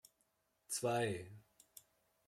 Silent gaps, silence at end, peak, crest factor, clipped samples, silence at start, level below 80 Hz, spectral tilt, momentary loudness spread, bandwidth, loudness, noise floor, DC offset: none; 0.9 s; -26 dBFS; 18 dB; under 0.1%; 0.7 s; -80 dBFS; -4 dB/octave; 23 LU; 16.5 kHz; -40 LUFS; -81 dBFS; under 0.1%